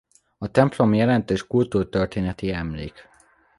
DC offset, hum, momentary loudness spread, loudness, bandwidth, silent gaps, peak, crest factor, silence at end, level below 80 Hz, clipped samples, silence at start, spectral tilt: under 0.1%; none; 14 LU; -22 LUFS; 11.5 kHz; none; -2 dBFS; 20 dB; 0.55 s; -44 dBFS; under 0.1%; 0.4 s; -7.5 dB/octave